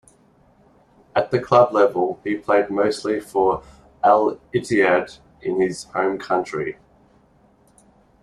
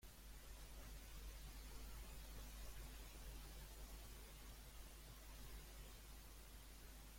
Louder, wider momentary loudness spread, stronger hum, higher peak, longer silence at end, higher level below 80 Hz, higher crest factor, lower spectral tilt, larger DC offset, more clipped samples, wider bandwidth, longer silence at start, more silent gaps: first, -20 LUFS vs -59 LUFS; first, 10 LU vs 3 LU; neither; first, -2 dBFS vs -44 dBFS; first, 1.5 s vs 0 s; about the same, -56 dBFS vs -58 dBFS; first, 20 dB vs 14 dB; first, -5.5 dB/octave vs -3.5 dB/octave; neither; neither; second, 12.5 kHz vs 16.5 kHz; first, 1.15 s vs 0 s; neither